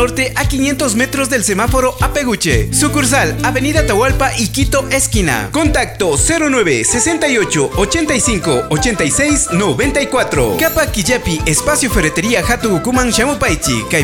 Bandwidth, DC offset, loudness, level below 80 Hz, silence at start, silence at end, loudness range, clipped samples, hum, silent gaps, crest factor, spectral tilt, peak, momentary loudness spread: over 20 kHz; under 0.1%; -13 LUFS; -26 dBFS; 0 s; 0 s; 1 LU; under 0.1%; none; none; 14 dB; -3.5 dB/octave; 0 dBFS; 3 LU